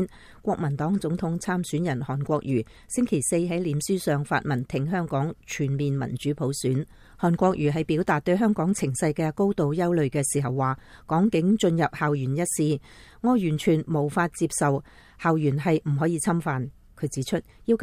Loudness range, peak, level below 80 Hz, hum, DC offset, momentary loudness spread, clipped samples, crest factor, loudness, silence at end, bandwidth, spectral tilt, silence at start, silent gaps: 3 LU; -8 dBFS; -52 dBFS; none; under 0.1%; 7 LU; under 0.1%; 16 dB; -25 LUFS; 0 s; 15.5 kHz; -6 dB/octave; 0 s; none